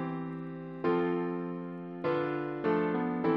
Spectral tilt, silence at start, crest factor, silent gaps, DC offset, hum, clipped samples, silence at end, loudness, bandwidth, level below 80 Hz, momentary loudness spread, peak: -9.5 dB/octave; 0 s; 16 dB; none; under 0.1%; none; under 0.1%; 0 s; -33 LUFS; 5.6 kHz; -72 dBFS; 10 LU; -16 dBFS